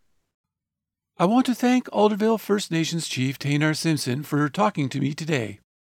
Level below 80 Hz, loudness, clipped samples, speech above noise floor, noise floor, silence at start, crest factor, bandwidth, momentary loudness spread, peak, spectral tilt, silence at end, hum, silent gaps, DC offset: -70 dBFS; -23 LUFS; under 0.1%; 64 dB; -87 dBFS; 1.2 s; 18 dB; 17 kHz; 6 LU; -6 dBFS; -5.5 dB/octave; 0.4 s; none; none; under 0.1%